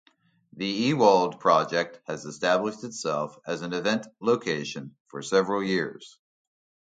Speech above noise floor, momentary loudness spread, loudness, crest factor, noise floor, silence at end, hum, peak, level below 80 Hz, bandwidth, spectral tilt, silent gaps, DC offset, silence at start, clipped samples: 33 dB; 15 LU; -26 LUFS; 20 dB; -59 dBFS; 0.8 s; none; -6 dBFS; -72 dBFS; 9.2 kHz; -4.5 dB/octave; 5.00-5.06 s; under 0.1%; 0.55 s; under 0.1%